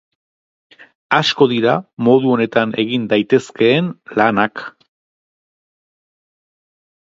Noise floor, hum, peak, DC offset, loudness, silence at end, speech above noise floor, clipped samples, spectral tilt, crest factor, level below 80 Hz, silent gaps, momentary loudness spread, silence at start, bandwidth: under -90 dBFS; none; 0 dBFS; under 0.1%; -15 LUFS; 2.3 s; over 75 dB; under 0.1%; -6 dB/octave; 18 dB; -62 dBFS; 1.93-1.97 s; 6 LU; 1.1 s; 7.8 kHz